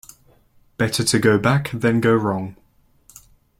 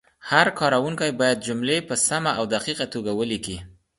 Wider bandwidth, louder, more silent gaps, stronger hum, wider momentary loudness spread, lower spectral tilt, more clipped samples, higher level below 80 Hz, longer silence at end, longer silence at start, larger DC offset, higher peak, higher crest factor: first, 16.5 kHz vs 11.5 kHz; first, -19 LUFS vs -22 LUFS; neither; neither; about the same, 8 LU vs 8 LU; first, -5 dB/octave vs -3 dB/octave; neither; about the same, -52 dBFS vs -54 dBFS; first, 1.05 s vs 0.3 s; first, 0.8 s vs 0.25 s; neither; about the same, -2 dBFS vs 0 dBFS; about the same, 18 dB vs 22 dB